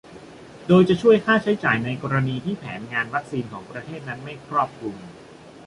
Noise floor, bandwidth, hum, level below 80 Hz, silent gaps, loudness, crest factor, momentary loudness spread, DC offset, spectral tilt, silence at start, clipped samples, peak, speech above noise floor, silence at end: -43 dBFS; 11 kHz; none; -56 dBFS; none; -21 LUFS; 18 dB; 19 LU; under 0.1%; -7.5 dB/octave; 0.1 s; under 0.1%; -4 dBFS; 21 dB; 0.05 s